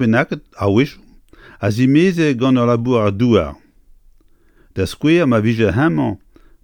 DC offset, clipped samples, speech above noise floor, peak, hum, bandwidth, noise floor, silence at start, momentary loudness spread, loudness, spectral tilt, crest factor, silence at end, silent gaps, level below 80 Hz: under 0.1%; under 0.1%; 36 dB; 0 dBFS; none; 17 kHz; -51 dBFS; 0 s; 10 LU; -16 LUFS; -7.5 dB/octave; 16 dB; 0.45 s; none; -44 dBFS